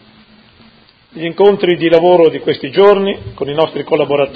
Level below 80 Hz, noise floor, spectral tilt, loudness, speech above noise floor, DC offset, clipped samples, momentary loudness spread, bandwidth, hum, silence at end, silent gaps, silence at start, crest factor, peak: -48 dBFS; -46 dBFS; -8 dB/octave; -12 LUFS; 35 dB; under 0.1%; 0.3%; 11 LU; 5 kHz; none; 0 s; none; 1.15 s; 12 dB; 0 dBFS